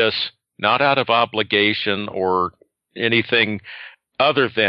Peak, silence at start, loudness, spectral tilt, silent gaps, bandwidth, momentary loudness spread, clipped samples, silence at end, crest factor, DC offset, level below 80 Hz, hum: -2 dBFS; 0 s; -19 LUFS; -7.5 dB/octave; none; 5.8 kHz; 11 LU; under 0.1%; 0 s; 18 dB; under 0.1%; -66 dBFS; none